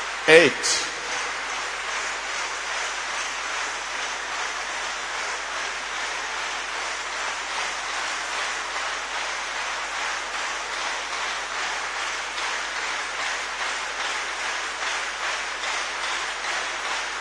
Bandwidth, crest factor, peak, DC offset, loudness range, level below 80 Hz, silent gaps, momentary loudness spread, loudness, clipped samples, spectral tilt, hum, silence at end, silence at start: 10.5 kHz; 26 dB; 0 dBFS; under 0.1%; 1 LU; -56 dBFS; none; 2 LU; -25 LUFS; under 0.1%; -0.5 dB/octave; none; 0 s; 0 s